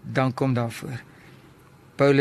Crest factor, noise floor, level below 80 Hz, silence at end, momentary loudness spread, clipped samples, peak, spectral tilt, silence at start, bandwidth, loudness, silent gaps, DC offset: 20 dB; -51 dBFS; -60 dBFS; 0 s; 16 LU; under 0.1%; -4 dBFS; -7 dB/octave; 0.05 s; 13 kHz; -25 LUFS; none; under 0.1%